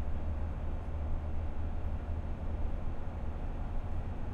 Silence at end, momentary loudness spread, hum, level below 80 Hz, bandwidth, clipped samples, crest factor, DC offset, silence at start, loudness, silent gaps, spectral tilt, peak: 0 s; 3 LU; none; -36 dBFS; 4 kHz; under 0.1%; 10 dB; under 0.1%; 0 s; -40 LUFS; none; -9 dB/octave; -24 dBFS